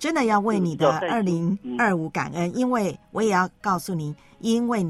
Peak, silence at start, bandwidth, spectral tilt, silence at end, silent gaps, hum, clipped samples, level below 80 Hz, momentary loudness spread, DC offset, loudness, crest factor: -6 dBFS; 0 s; 14 kHz; -6 dB/octave; 0 s; none; none; under 0.1%; -60 dBFS; 7 LU; under 0.1%; -24 LUFS; 16 dB